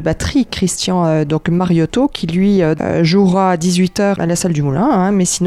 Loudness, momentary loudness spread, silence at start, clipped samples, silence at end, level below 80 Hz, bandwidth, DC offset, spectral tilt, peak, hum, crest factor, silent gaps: -14 LUFS; 4 LU; 0 s; under 0.1%; 0 s; -38 dBFS; 13.5 kHz; under 0.1%; -5.5 dB/octave; -2 dBFS; none; 12 dB; none